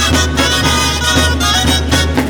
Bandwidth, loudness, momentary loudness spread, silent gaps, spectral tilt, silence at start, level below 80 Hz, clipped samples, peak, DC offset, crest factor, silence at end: over 20 kHz; -11 LUFS; 1 LU; none; -3 dB/octave; 0 s; -20 dBFS; under 0.1%; 0 dBFS; 0.1%; 12 dB; 0 s